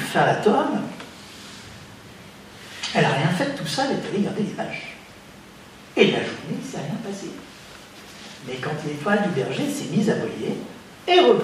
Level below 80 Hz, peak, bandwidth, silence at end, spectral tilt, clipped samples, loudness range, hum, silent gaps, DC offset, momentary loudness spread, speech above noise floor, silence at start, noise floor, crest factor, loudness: -62 dBFS; 0 dBFS; 15.5 kHz; 0 s; -5 dB/octave; under 0.1%; 3 LU; none; none; under 0.1%; 23 LU; 22 dB; 0 s; -44 dBFS; 24 dB; -23 LUFS